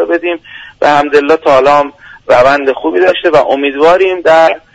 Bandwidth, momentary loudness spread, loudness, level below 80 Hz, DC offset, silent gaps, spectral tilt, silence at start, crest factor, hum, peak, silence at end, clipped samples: 10 kHz; 7 LU; -9 LUFS; -44 dBFS; under 0.1%; none; -5 dB/octave; 0 s; 8 dB; none; 0 dBFS; 0.15 s; 0.4%